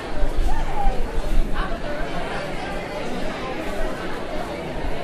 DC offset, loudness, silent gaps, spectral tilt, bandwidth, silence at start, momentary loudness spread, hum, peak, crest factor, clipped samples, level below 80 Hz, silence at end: under 0.1%; -28 LUFS; none; -5.5 dB/octave; 11 kHz; 0 s; 3 LU; none; -4 dBFS; 16 dB; under 0.1%; -24 dBFS; 0 s